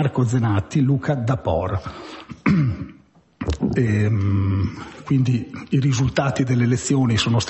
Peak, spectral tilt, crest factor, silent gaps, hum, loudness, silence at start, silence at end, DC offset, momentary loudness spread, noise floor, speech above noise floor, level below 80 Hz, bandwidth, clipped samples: -6 dBFS; -6.5 dB/octave; 14 dB; none; none; -21 LUFS; 0 s; 0 s; under 0.1%; 10 LU; -51 dBFS; 32 dB; -38 dBFS; 8.4 kHz; under 0.1%